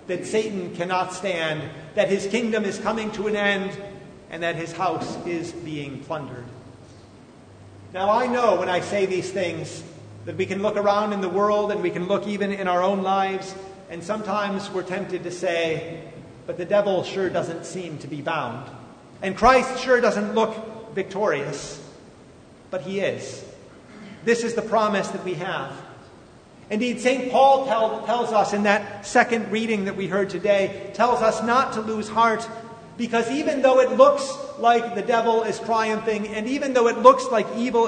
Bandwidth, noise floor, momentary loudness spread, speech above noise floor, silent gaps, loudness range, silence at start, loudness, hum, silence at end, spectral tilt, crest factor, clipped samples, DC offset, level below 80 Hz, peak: 9.6 kHz; -48 dBFS; 17 LU; 25 dB; none; 8 LU; 0 s; -23 LUFS; none; 0 s; -5 dB/octave; 24 dB; under 0.1%; under 0.1%; -56 dBFS; 0 dBFS